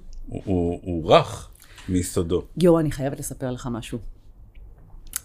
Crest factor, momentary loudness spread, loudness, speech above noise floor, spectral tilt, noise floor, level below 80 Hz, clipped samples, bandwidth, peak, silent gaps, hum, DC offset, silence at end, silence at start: 22 dB; 18 LU; -23 LUFS; 22 dB; -6 dB/octave; -45 dBFS; -40 dBFS; under 0.1%; 16 kHz; -2 dBFS; none; none; under 0.1%; 0.05 s; 0.05 s